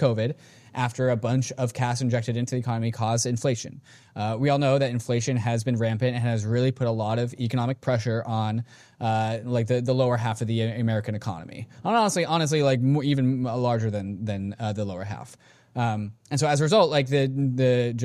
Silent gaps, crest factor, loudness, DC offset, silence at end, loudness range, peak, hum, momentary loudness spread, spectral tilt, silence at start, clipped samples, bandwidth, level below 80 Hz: none; 18 dB; -25 LUFS; under 0.1%; 0 s; 2 LU; -8 dBFS; none; 10 LU; -6 dB/octave; 0 s; under 0.1%; 12.5 kHz; -62 dBFS